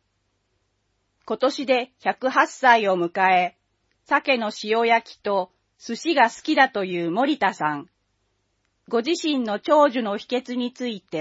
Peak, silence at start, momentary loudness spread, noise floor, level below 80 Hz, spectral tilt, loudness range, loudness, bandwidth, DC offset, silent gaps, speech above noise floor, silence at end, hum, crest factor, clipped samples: -2 dBFS; 1.3 s; 11 LU; -72 dBFS; -74 dBFS; -4 dB/octave; 3 LU; -22 LUFS; 8 kHz; under 0.1%; none; 50 dB; 0 s; none; 22 dB; under 0.1%